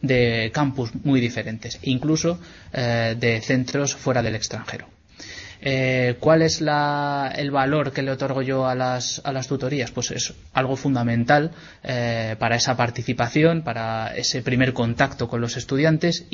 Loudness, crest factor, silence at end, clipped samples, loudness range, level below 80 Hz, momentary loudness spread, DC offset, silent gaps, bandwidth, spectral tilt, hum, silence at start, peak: -22 LUFS; 20 dB; 0.1 s; under 0.1%; 2 LU; -50 dBFS; 9 LU; under 0.1%; none; 7.6 kHz; -5 dB/octave; none; 0 s; -2 dBFS